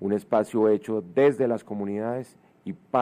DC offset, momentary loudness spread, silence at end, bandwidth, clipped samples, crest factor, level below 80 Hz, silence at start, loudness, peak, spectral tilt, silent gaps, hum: under 0.1%; 18 LU; 0 s; 13 kHz; under 0.1%; 16 dB; -72 dBFS; 0 s; -25 LUFS; -10 dBFS; -7.5 dB/octave; none; none